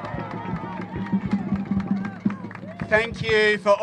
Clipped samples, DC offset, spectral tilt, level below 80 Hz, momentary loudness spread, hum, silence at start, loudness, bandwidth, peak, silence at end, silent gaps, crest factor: under 0.1%; under 0.1%; -6.5 dB/octave; -48 dBFS; 13 LU; none; 0 s; -24 LUFS; 9.6 kHz; -4 dBFS; 0 s; none; 20 dB